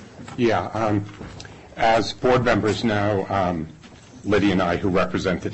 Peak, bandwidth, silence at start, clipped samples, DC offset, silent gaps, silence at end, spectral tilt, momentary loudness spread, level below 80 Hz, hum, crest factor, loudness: -8 dBFS; 8.6 kHz; 0 s; under 0.1%; under 0.1%; none; 0 s; -6 dB/octave; 17 LU; -42 dBFS; none; 14 dB; -21 LUFS